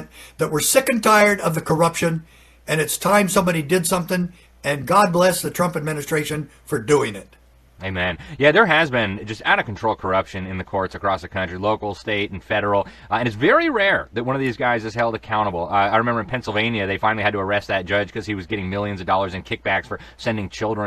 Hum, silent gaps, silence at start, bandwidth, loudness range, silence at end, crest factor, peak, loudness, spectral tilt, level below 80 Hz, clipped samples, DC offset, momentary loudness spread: none; none; 0 s; 13.5 kHz; 4 LU; 0 s; 20 dB; 0 dBFS; -20 LUFS; -4.5 dB/octave; -48 dBFS; under 0.1%; under 0.1%; 10 LU